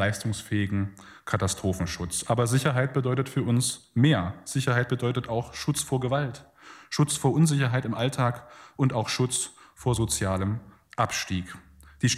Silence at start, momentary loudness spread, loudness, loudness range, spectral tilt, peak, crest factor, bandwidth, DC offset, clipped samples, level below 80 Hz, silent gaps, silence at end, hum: 0 s; 10 LU; -27 LUFS; 3 LU; -5 dB/octave; -8 dBFS; 18 dB; 15.5 kHz; under 0.1%; under 0.1%; -54 dBFS; none; 0 s; none